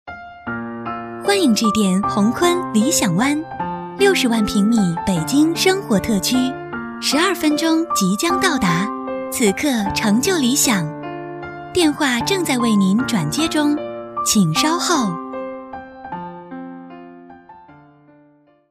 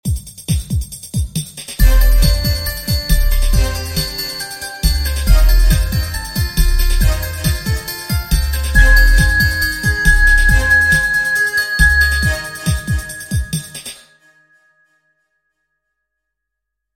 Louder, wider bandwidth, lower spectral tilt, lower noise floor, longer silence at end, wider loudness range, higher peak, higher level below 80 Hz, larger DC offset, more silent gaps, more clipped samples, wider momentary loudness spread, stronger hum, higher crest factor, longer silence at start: second, -18 LUFS vs -15 LUFS; about the same, 16 kHz vs 16.5 kHz; about the same, -4 dB/octave vs -3.5 dB/octave; second, -53 dBFS vs -79 dBFS; second, 0.95 s vs 3 s; second, 4 LU vs 10 LU; about the same, -2 dBFS vs 0 dBFS; second, -48 dBFS vs -16 dBFS; neither; neither; neither; first, 15 LU vs 12 LU; neither; about the same, 18 dB vs 14 dB; about the same, 0.05 s vs 0.05 s